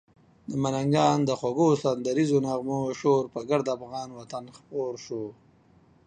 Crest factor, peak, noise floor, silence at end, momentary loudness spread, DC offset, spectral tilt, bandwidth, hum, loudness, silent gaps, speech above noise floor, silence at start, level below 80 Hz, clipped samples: 20 dB; -8 dBFS; -59 dBFS; 0.75 s; 14 LU; under 0.1%; -6.5 dB/octave; 9.6 kHz; none; -27 LUFS; none; 33 dB; 0.5 s; -64 dBFS; under 0.1%